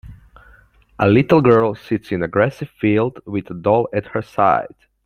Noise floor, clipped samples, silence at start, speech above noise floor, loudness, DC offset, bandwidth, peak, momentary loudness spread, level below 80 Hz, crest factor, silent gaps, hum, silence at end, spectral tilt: -50 dBFS; under 0.1%; 0.05 s; 33 dB; -18 LUFS; under 0.1%; 9.4 kHz; -2 dBFS; 12 LU; -48 dBFS; 16 dB; none; none; 0.4 s; -9 dB/octave